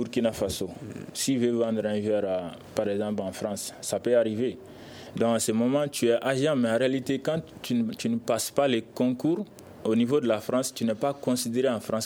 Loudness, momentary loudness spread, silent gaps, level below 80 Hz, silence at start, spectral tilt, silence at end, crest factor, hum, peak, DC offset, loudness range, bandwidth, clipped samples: -27 LUFS; 8 LU; none; -62 dBFS; 0 s; -5 dB/octave; 0 s; 18 dB; none; -10 dBFS; under 0.1%; 3 LU; 18 kHz; under 0.1%